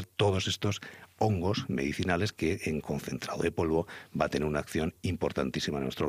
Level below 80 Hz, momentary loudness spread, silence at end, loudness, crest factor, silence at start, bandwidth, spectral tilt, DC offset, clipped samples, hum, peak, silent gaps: -52 dBFS; 6 LU; 0 s; -31 LUFS; 20 dB; 0 s; 15.5 kHz; -5.5 dB/octave; under 0.1%; under 0.1%; none; -12 dBFS; none